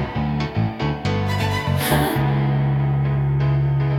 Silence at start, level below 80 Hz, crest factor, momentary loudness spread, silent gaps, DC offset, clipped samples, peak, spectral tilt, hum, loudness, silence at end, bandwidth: 0 s; -36 dBFS; 14 dB; 4 LU; none; under 0.1%; under 0.1%; -6 dBFS; -6.5 dB/octave; none; -20 LUFS; 0 s; 16.5 kHz